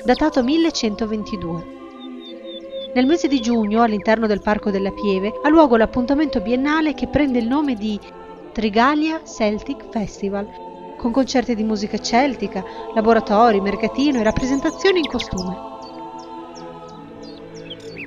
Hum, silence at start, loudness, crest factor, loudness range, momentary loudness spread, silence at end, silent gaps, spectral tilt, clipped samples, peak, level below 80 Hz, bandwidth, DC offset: none; 0 s; -19 LUFS; 20 dB; 5 LU; 19 LU; 0 s; none; -5.5 dB/octave; under 0.1%; 0 dBFS; -42 dBFS; 7.6 kHz; under 0.1%